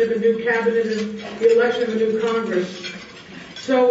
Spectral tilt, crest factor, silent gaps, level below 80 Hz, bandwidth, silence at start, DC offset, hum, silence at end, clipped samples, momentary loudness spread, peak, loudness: -5.5 dB/octave; 14 dB; none; -62 dBFS; 8 kHz; 0 s; under 0.1%; none; 0 s; under 0.1%; 17 LU; -6 dBFS; -20 LUFS